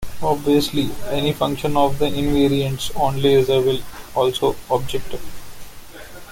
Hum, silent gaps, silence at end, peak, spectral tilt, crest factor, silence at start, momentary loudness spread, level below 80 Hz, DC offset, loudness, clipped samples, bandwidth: none; none; 0 s; -4 dBFS; -5.5 dB/octave; 16 dB; 0 s; 22 LU; -38 dBFS; under 0.1%; -20 LUFS; under 0.1%; 17 kHz